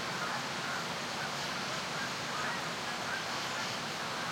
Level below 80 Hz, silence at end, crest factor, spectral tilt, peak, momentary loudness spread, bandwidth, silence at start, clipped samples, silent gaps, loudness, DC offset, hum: -70 dBFS; 0 s; 14 dB; -2.5 dB/octave; -22 dBFS; 1 LU; 16.5 kHz; 0 s; under 0.1%; none; -35 LUFS; under 0.1%; none